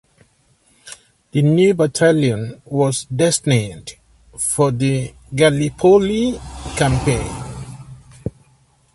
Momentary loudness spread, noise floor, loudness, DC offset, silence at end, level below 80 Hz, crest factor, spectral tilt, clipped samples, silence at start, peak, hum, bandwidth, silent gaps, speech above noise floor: 19 LU; -57 dBFS; -17 LUFS; under 0.1%; 0.65 s; -40 dBFS; 18 dB; -5.5 dB/octave; under 0.1%; 0.85 s; 0 dBFS; none; 12 kHz; none; 41 dB